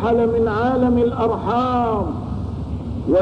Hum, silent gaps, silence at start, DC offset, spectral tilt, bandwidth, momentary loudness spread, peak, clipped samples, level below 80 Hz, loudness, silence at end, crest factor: none; none; 0 s; 0.3%; -9 dB/octave; 7.2 kHz; 10 LU; -8 dBFS; under 0.1%; -34 dBFS; -20 LUFS; 0 s; 12 dB